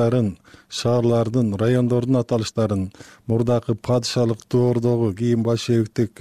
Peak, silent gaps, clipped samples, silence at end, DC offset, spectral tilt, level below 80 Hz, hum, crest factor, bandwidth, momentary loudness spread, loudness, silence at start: -8 dBFS; none; under 0.1%; 0.15 s; 0.2%; -7 dB/octave; -52 dBFS; none; 12 dB; 12 kHz; 6 LU; -21 LUFS; 0 s